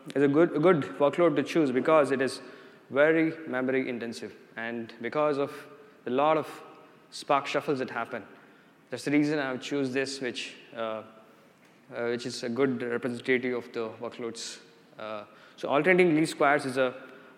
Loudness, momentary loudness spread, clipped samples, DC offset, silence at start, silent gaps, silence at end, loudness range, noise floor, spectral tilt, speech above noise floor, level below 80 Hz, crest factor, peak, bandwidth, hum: -28 LUFS; 18 LU; under 0.1%; under 0.1%; 0.05 s; none; 0.2 s; 6 LU; -58 dBFS; -5.5 dB/octave; 30 dB; -84 dBFS; 20 dB; -8 dBFS; 14.5 kHz; none